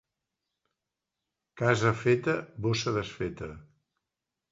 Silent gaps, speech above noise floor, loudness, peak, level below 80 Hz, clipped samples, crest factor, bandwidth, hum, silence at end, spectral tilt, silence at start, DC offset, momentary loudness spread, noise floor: none; 59 dB; -29 LUFS; -8 dBFS; -58 dBFS; under 0.1%; 24 dB; 7.8 kHz; none; 0.9 s; -5.5 dB/octave; 1.55 s; under 0.1%; 11 LU; -88 dBFS